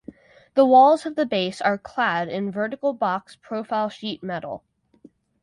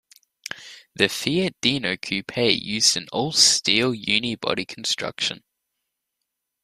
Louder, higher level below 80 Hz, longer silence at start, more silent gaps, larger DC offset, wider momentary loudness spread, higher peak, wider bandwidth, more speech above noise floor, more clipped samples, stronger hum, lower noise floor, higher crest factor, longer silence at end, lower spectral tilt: about the same, -22 LUFS vs -21 LUFS; second, -66 dBFS vs -60 dBFS; about the same, 0.55 s vs 0.5 s; neither; neither; second, 17 LU vs 20 LU; about the same, -4 dBFS vs -2 dBFS; second, 11.5 kHz vs 15.5 kHz; second, 32 dB vs 58 dB; neither; neither; second, -54 dBFS vs -81 dBFS; about the same, 18 dB vs 22 dB; second, 0.85 s vs 1.25 s; first, -5.5 dB/octave vs -2 dB/octave